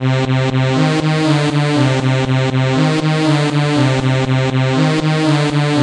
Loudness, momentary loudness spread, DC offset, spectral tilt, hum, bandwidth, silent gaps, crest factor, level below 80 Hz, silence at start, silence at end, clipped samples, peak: -14 LUFS; 1 LU; under 0.1%; -6.5 dB/octave; none; 10.5 kHz; none; 12 dB; -46 dBFS; 0 s; 0 s; under 0.1%; -2 dBFS